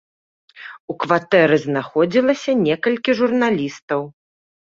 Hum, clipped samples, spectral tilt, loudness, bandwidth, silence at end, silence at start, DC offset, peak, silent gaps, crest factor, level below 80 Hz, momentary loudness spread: none; under 0.1%; -6 dB/octave; -18 LUFS; 7.6 kHz; 0.6 s; 0.55 s; under 0.1%; -2 dBFS; 0.80-0.88 s, 3.82-3.88 s; 18 dB; -62 dBFS; 18 LU